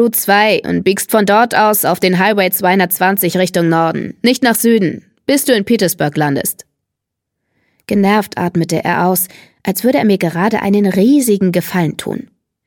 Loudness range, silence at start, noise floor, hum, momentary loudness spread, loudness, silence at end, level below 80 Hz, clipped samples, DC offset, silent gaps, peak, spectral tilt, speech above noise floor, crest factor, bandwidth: 5 LU; 0 s; -78 dBFS; none; 8 LU; -13 LUFS; 0.45 s; -56 dBFS; under 0.1%; under 0.1%; none; 0 dBFS; -4.5 dB/octave; 65 dB; 14 dB; 17.5 kHz